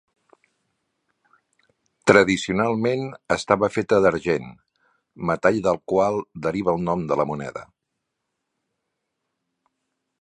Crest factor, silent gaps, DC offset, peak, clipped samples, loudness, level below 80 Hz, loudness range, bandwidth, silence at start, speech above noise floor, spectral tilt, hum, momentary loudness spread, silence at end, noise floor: 24 dB; none; under 0.1%; 0 dBFS; under 0.1%; -22 LUFS; -54 dBFS; 8 LU; 10.5 kHz; 2.05 s; 59 dB; -5.5 dB/octave; none; 11 LU; 2.55 s; -80 dBFS